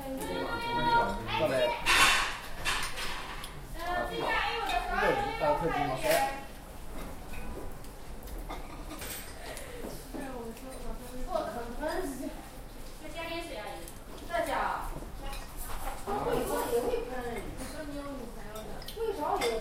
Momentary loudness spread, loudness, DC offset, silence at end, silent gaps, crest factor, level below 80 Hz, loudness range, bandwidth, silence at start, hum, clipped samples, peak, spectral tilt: 16 LU; -32 LUFS; under 0.1%; 0 s; none; 22 dB; -44 dBFS; 13 LU; 16 kHz; 0 s; none; under 0.1%; -10 dBFS; -3 dB/octave